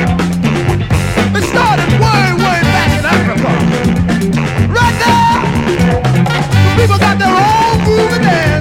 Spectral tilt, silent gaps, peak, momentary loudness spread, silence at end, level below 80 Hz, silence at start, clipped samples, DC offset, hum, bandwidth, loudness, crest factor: -6 dB/octave; none; 0 dBFS; 4 LU; 0 s; -26 dBFS; 0 s; under 0.1%; under 0.1%; none; 16.5 kHz; -11 LUFS; 10 dB